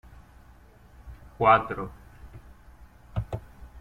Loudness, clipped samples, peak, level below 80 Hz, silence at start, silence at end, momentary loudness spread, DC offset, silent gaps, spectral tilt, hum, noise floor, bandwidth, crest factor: -26 LUFS; under 0.1%; -6 dBFS; -48 dBFS; 0.15 s; 0 s; 29 LU; under 0.1%; none; -7.5 dB/octave; 60 Hz at -55 dBFS; -53 dBFS; 15.5 kHz; 24 dB